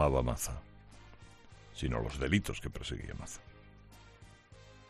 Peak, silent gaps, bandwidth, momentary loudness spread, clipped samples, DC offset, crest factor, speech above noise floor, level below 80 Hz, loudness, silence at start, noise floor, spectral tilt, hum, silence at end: -14 dBFS; none; 13.5 kHz; 25 LU; under 0.1%; under 0.1%; 24 dB; 22 dB; -46 dBFS; -36 LUFS; 0 s; -57 dBFS; -5 dB/octave; none; 0.05 s